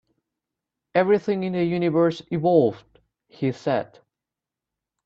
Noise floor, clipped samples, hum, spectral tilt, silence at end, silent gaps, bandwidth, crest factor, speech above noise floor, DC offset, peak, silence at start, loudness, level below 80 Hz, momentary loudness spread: -88 dBFS; under 0.1%; none; -8 dB/octave; 1.2 s; none; 7.6 kHz; 20 dB; 66 dB; under 0.1%; -6 dBFS; 0.95 s; -23 LUFS; -66 dBFS; 8 LU